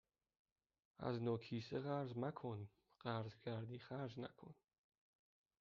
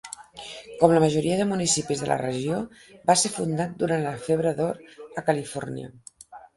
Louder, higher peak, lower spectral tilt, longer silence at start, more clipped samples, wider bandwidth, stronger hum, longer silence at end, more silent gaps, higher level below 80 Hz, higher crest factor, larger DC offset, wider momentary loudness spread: second, -48 LUFS vs -24 LUFS; second, -28 dBFS vs -2 dBFS; first, -6.5 dB/octave vs -4.5 dB/octave; first, 1 s vs 0.05 s; neither; second, 7 kHz vs 11.5 kHz; neither; first, 1.05 s vs 0.15 s; neither; second, -82 dBFS vs -58 dBFS; about the same, 20 dB vs 22 dB; neither; second, 10 LU vs 18 LU